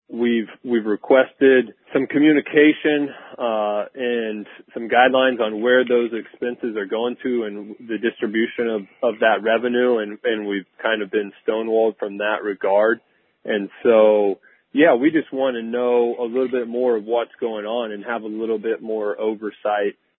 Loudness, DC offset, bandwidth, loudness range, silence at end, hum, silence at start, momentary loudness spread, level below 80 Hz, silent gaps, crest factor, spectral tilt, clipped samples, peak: -20 LUFS; under 0.1%; 4 kHz; 5 LU; 0.25 s; none; 0.1 s; 11 LU; -72 dBFS; none; 20 dB; -9.5 dB/octave; under 0.1%; 0 dBFS